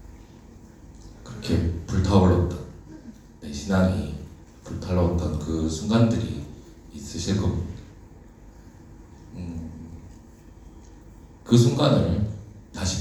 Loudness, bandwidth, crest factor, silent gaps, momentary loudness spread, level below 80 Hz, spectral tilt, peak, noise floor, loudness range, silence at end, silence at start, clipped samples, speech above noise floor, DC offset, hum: -24 LUFS; 13 kHz; 20 dB; none; 25 LU; -40 dBFS; -6.5 dB/octave; -4 dBFS; -47 dBFS; 14 LU; 0 s; 0 s; under 0.1%; 25 dB; under 0.1%; none